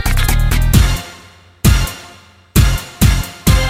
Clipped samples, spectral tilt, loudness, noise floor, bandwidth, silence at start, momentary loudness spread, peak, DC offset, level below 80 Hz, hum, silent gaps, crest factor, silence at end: under 0.1%; -4.5 dB/octave; -15 LUFS; -41 dBFS; 16.5 kHz; 0 s; 10 LU; 0 dBFS; under 0.1%; -16 dBFS; none; none; 14 dB; 0 s